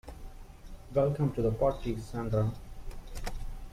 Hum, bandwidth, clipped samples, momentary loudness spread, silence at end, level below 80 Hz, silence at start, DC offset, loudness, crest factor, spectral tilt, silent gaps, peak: none; 15.5 kHz; under 0.1%; 23 LU; 0 s; -42 dBFS; 0.05 s; under 0.1%; -32 LUFS; 16 dB; -8 dB/octave; none; -16 dBFS